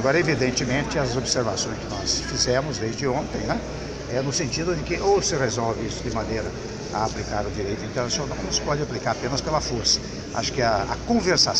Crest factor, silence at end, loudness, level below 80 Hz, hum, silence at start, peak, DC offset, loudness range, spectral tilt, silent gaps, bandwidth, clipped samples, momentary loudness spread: 18 dB; 0 s; -24 LUFS; -40 dBFS; none; 0 s; -6 dBFS; under 0.1%; 3 LU; -3.5 dB/octave; none; 10.5 kHz; under 0.1%; 7 LU